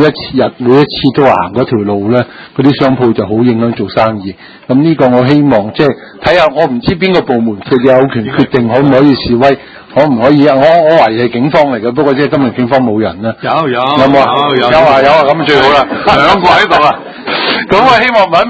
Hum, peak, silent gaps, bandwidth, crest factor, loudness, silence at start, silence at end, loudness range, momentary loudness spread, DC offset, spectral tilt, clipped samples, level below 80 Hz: none; 0 dBFS; none; 8 kHz; 8 dB; -8 LUFS; 0 s; 0 s; 3 LU; 7 LU; under 0.1%; -7 dB/octave; 2%; -38 dBFS